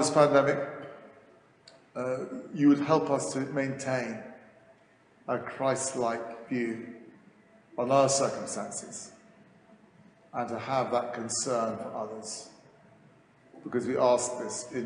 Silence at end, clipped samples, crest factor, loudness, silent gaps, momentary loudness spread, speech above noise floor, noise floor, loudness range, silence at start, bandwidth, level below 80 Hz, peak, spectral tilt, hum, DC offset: 0 s; under 0.1%; 22 dB; -29 LUFS; none; 19 LU; 33 dB; -61 dBFS; 4 LU; 0 s; 10 kHz; -74 dBFS; -10 dBFS; -4.5 dB/octave; none; under 0.1%